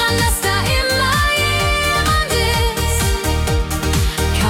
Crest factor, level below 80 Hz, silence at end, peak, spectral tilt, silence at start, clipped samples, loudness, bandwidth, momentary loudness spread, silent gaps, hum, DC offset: 12 dB; -22 dBFS; 0 s; -4 dBFS; -3.5 dB/octave; 0 s; under 0.1%; -16 LUFS; 17.5 kHz; 4 LU; none; none; under 0.1%